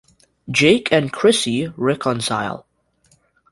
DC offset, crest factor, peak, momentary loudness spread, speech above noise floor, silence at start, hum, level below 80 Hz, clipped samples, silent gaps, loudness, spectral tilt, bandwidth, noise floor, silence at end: under 0.1%; 18 dB; 0 dBFS; 9 LU; 42 dB; 0.45 s; none; -56 dBFS; under 0.1%; none; -18 LUFS; -4.5 dB/octave; 11.5 kHz; -60 dBFS; 0.9 s